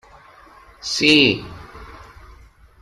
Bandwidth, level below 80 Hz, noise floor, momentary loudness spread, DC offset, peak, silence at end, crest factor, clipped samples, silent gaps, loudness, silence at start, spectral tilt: 13 kHz; -48 dBFS; -47 dBFS; 27 LU; under 0.1%; -2 dBFS; 0.9 s; 22 dB; under 0.1%; none; -15 LUFS; 0.85 s; -3.5 dB/octave